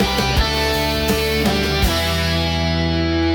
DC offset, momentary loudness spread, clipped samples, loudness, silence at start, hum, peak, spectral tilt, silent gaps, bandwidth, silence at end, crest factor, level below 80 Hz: under 0.1%; 2 LU; under 0.1%; -18 LUFS; 0 s; none; -4 dBFS; -4.5 dB/octave; none; 19 kHz; 0 s; 14 dB; -26 dBFS